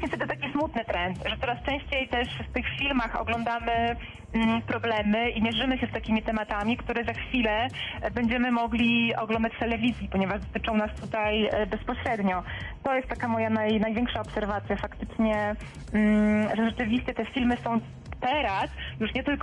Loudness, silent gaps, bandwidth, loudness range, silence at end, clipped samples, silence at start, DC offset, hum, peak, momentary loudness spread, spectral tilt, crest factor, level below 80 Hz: -28 LUFS; none; 10.5 kHz; 2 LU; 0 s; under 0.1%; 0 s; under 0.1%; none; -14 dBFS; 6 LU; -6.5 dB/octave; 14 dB; -42 dBFS